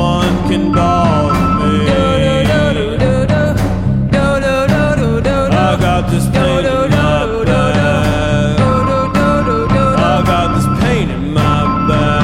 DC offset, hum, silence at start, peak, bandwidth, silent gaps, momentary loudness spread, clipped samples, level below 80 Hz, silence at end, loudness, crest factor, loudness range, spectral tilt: under 0.1%; none; 0 s; 0 dBFS; 16 kHz; none; 2 LU; under 0.1%; -24 dBFS; 0 s; -12 LUFS; 12 dB; 1 LU; -6.5 dB/octave